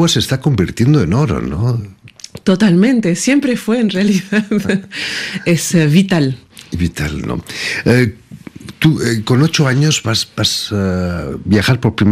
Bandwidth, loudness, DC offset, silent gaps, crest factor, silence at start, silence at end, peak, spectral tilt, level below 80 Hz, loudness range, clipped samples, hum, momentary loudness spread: 15.5 kHz; -14 LUFS; under 0.1%; none; 14 dB; 0 s; 0 s; 0 dBFS; -5.5 dB/octave; -38 dBFS; 2 LU; under 0.1%; none; 10 LU